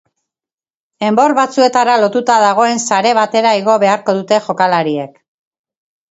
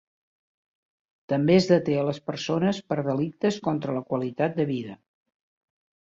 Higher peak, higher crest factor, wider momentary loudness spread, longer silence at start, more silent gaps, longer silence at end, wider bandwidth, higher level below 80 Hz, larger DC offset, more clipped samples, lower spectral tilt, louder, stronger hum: first, 0 dBFS vs -6 dBFS; second, 14 dB vs 20 dB; second, 5 LU vs 9 LU; second, 1 s vs 1.3 s; neither; about the same, 1.05 s vs 1.15 s; about the same, 8.2 kHz vs 7.8 kHz; about the same, -64 dBFS vs -64 dBFS; neither; neither; second, -4 dB/octave vs -7 dB/octave; first, -12 LUFS vs -25 LUFS; neither